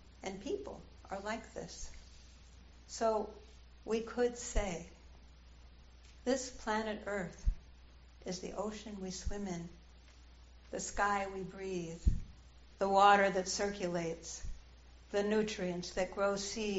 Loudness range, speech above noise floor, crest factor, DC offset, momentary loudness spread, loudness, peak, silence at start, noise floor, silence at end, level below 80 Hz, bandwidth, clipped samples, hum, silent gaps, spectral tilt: 9 LU; 22 dB; 24 dB; under 0.1%; 16 LU; -37 LUFS; -14 dBFS; 0 s; -58 dBFS; 0 s; -46 dBFS; 8 kHz; under 0.1%; none; none; -3.5 dB/octave